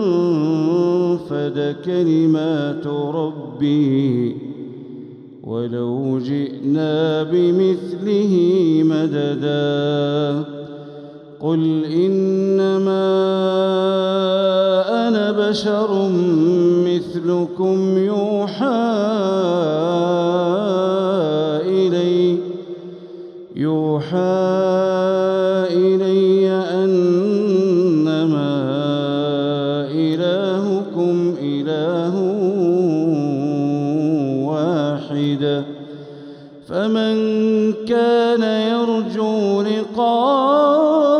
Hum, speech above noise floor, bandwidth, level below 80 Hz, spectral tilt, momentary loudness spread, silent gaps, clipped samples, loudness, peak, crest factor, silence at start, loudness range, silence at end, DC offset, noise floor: none; 20 dB; 8.8 kHz; -66 dBFS; -7.5 dB/octave; 9 LU; none; under 0.1%; -18 LUFS; -4 dBFS; 12 dB; 0 s; 4 LU; 0 s; under 0.1%; -37 dBFS